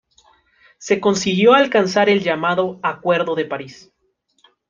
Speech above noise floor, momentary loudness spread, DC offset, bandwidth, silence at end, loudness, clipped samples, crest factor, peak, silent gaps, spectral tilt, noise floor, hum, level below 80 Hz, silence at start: 49 dB; 13 LU; under 0.1%; 9.2 kHz; 0.95 s; -17 LUFS; under 0.1%; 16 dB; -2 dBFS; none; -4.5 dB/octave; -66 dBFS; none; -62 dBFS; 0.8 s